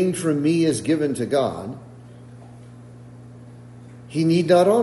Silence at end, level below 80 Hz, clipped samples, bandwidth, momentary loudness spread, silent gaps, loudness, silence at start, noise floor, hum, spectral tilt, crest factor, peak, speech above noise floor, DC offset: 0 s; -60 dBFS; under 0.1%; 11.5 kHz; 26 LU; none; -20 LUFS; 0 s; -42 dBFS; 60 Hz at -45 dBFS; -6 dB/octave; 18 dB; -4 dBFS; 23 dB; under 0.1%